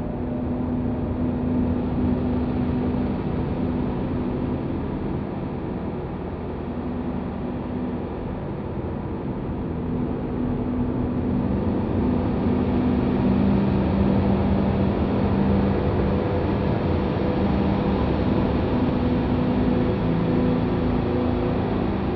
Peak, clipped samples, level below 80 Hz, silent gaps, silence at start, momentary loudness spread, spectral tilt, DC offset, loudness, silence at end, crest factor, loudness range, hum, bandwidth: -8 dBFS; under 0.1%; -34 dBFS; none; 0 s; 8 LU; -11 dB/octave; under 0.1%; -24 LUFS; 0 s; 14 dB; 8 LU; none; 5.6 kHz